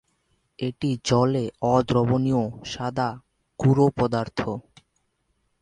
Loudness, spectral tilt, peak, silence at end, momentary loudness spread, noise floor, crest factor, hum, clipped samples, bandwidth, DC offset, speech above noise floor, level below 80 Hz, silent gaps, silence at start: -24 LUFS; -7 dB/octave; -6 dBFS; 1 s; 11 LU; -71 dBFS; 18 dB; none; under 0.1%; 10 kHz; under 0.1%; 49 dB; -52 dBFS; none; 0.6 s